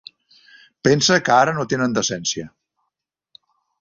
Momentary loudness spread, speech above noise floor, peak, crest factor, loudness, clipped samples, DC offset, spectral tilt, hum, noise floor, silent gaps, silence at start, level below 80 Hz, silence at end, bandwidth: 11 LU; 61 dB; -2 dBFS; 20 dB; -18 LUFS; under 0.1%; under 0.1%; -3.5 dB/octave; none; -80 dBFS; none; 0.85 s; -58 dBFS; 1.35 s; 7.8 kHz